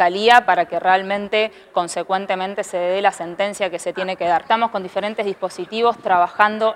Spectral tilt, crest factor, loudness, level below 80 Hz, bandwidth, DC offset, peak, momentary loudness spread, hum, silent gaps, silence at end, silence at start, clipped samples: -3.5 dB/octave; 18 dB; -19 LUFS; -64 dBFS; 14 kHz; under 0.1%; 0 dBFS; 10 LU; none; none; 0 s; 0 s; under 0.1%